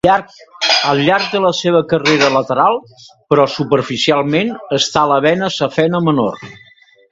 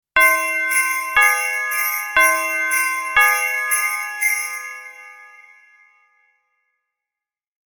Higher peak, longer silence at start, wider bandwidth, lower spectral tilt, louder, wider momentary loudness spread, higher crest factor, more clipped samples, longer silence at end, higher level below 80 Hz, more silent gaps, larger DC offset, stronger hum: about the same, 0 dBFS vs -2 dBFS; about the same, 0.05 s vs 0.15 s; second, 8 kHz vs 19 kHz; first, -4.5 dB/octave vs 1.5 dB/octave; about the same, -14 LUFS vs -16 LUFS; second, 5 LU vs 9 LU; about the same, 14 dB vs 18 dB; neither; second, 0.55 s vs 2.25 s; first, -50 dBFS vs -56 dBFS; neither; neither; neither